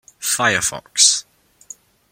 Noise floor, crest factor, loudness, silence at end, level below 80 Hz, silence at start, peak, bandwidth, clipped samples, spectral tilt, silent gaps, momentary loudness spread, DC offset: -51 dBFS; 20 dB; -16 LUFS; 0.9 s; -56 dBFS; 0.2 s; 0 dBFS; 16.5 kHz; under 0.1%; 0 dB/octave; none; 8 LU; under 0.1%